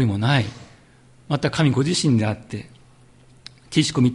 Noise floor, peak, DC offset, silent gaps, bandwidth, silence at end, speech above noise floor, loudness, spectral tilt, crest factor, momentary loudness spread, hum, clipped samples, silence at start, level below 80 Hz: -51 dBFS; -4 dBFS; under 0.1%; none; 11.5 kHz; 0 s; 32 dB; -21 LUFS; -5.5 dB/octave; 18 dB; 12 LU; none; under 0.1%; 0 s; -50 dBFS